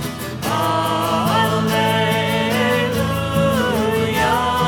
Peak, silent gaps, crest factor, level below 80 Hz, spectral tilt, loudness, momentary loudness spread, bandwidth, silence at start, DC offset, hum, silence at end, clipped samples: -4 dBFS; none; 14 dB; -40 dBFS; -5 dB/octave; -18 LUFS; 3 LU; 18 kHz; 0 s; under 0.1%; none; 0 s; under 0.1%